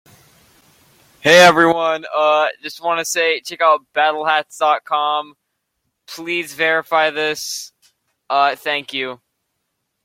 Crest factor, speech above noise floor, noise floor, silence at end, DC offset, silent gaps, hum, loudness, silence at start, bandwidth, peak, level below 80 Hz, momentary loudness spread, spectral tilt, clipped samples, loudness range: 18 dB; 57 dB; -73 dBFS; 0.9 s; under 0.1%; none; none; -16 LUFS; 1.25 s; 16.5 kHz; 0 dBFS; -66 dBFS; 14 LU; -2.5 dB/octave; under 0.1%; 6 LU